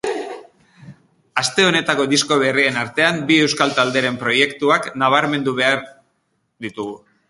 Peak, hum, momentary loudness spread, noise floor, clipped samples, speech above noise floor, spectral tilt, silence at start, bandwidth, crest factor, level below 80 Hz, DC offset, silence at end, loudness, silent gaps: 0 dBFS; none; 14 LU; -68 dBFS; under 0.1%; 51 dB; -3.5 dB/octave; 0.05 s; 11.5 kHz; 20 dB; -62 dBFS; under 0.1%; 0.3 s; -17 LUFS; none